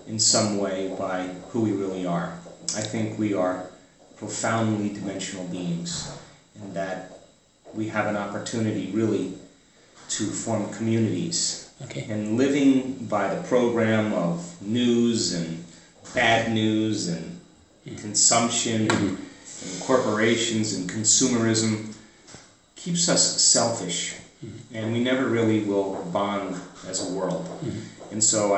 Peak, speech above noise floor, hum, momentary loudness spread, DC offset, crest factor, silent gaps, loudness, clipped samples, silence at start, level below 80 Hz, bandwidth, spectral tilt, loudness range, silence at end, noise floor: -4 dBFS; 31 dB; none; 17 LU; under 0.1%; 20 dB; none; -24 LUFS; under 0.1%; 0 s; -62 dBFS; 8.6 kHz; -3.5 dB/octave; 7 LU; 0 s; -55 dBFS